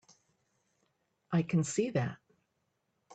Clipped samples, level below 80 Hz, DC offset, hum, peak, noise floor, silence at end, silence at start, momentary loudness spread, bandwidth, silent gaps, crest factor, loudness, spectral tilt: under 0.1%; -72 dBFS; under 0.1%; none; -18 dBFS; -80 dBFS; 0 s; 1.3 s; 5 LU; 9.2 kHz; none; 20 dB; -33 LUFS; -6.5 dB/octave